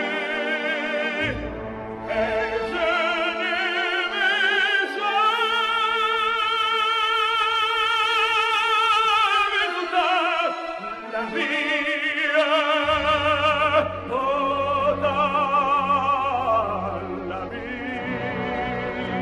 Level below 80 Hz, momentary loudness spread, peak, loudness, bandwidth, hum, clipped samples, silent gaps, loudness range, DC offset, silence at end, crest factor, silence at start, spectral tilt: -50 dBFS; 10 LU; -8 dBFS; -22 LUFS; 14 kHz; none; under 0.1%; none; 4 LU; under 0.1%; 0 s; 14 dB; 0 s; -4 dB/octave